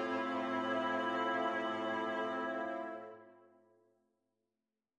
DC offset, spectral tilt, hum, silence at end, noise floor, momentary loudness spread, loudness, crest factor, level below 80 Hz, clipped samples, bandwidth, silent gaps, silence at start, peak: under 0.1%; -5 dB/octave; none; 1.65 s; under -90 dBFS; 11 LU; -37 LUFS; 16 dB; -88 dBFS; under 0.1%; 10 kHz; none; 0 s; -22 dBFS